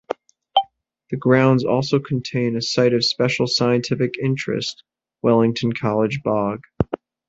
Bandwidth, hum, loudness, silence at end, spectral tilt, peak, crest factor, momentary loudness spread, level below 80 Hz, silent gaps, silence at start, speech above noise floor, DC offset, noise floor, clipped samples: 8 kHz; none; -20 LUFS; 0.35 s; -6 dB/octave; -2 dBFS; 18 dB; 9 LU; -48 dBFS; none; 0.1 s; 30 dB; under 0.1%; -49 dBFS; under 0.1%